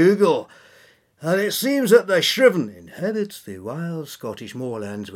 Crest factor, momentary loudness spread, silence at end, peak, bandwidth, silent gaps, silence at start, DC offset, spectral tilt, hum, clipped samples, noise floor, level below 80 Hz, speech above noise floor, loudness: 20 dB; 16 LU; 0 s; -2 dBFS; 17.5 kHz; none; 0 s; under 0.1%; -4.5 dB/octave; none; under 0.1%; -54 dBFS; -74 dBFS; 33 dB; -20 LUFS